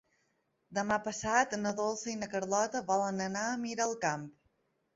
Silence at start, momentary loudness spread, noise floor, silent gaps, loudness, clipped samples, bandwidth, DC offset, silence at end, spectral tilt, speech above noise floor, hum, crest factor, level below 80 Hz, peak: 0.7 s; 7 LU; -77 dBFS; none; -33 LUFS; under 0.1%; 8 kHz; under 0.1%; 0.65 s; -3.5 dB/octave; 44 dB; none; 20 dB; -68 dBFS; -14 dBFS